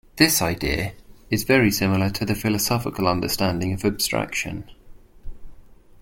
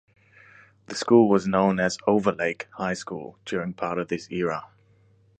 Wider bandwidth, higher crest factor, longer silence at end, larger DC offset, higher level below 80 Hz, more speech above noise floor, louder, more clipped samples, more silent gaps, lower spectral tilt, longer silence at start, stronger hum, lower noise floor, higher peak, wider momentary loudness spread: first, 17 kHz vs 9.4 kHz; about the same, 20 dB vs 20 dB; second, 0.25 s vs 0.75 s; neither; first, -42 dBFS vs -60 dBFS; second, 23 dB vs 36 dB; about the same, -22 LUFS vs -24 LUFS; neither; neither; second, -4 dB/octave vs -6 dB/octave; second, 0.15 s vs 0.9 s; neither; second, -45 dBFS vs -59 dBFS; about the same, -2 dBFS vs -4 dBFS; second, 9 LU vs 14 LU